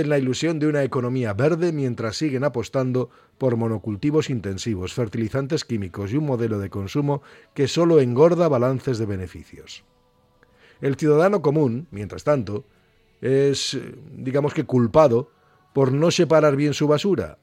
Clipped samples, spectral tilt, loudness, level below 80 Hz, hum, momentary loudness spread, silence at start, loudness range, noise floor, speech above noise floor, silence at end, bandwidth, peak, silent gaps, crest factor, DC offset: under 0.1%; -6.5 dB/octave; -22 LUFS; -56 dBFS; none; 14 LU; 0 s; 5 LU; -60 dBFS; 39 dB; 0.1 s; 14.5 kHz; -2 dBFS; none; 20 dB; under 0.1%